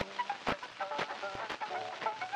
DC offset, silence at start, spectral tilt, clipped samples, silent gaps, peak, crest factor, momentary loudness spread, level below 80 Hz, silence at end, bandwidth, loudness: under 0.1%; 0 s; -3.5 dB/octave; under 0.1%; none; -18 dBFS; 20 dB; 3 LU; -66 dBFS; 0 s; 15 kHz; -38 LUFS